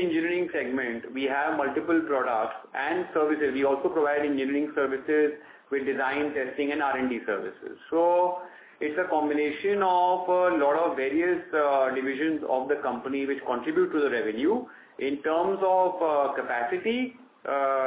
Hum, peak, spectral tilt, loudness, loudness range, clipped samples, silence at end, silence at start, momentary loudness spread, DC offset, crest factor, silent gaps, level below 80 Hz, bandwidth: none; -12 dBFS; -8.5 dB/octave; -27 LUFS; 3 LU; under 0.1%; 0 s; 0 s; 8 LU; under 0.1%; 14 dB; none; -68 dBFS; 4 kHz